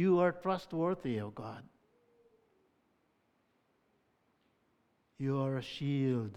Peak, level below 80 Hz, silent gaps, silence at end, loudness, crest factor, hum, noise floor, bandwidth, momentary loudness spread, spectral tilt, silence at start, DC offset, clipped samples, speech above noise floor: -16 dBFS; -74 dBFS; none; 0 s; -35 LUFS; 20 dB; none; -76 dBFS; 10.5 kHz; 14 LU; -8 dB/octave; 0 s; under 0.1%; under 0.1%; 42 dB